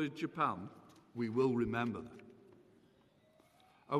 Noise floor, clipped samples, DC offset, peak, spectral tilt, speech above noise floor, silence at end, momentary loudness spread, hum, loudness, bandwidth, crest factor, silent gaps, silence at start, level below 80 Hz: -69 dBFS; under 0.1%; under 0.1%; -20 dBFS; -7.5 dB/octave; 32 dB; 0 s; 19 LU; none; -37 LUFS; 12.5 kHz; 18 dB; none; 0 s; -68 dBFS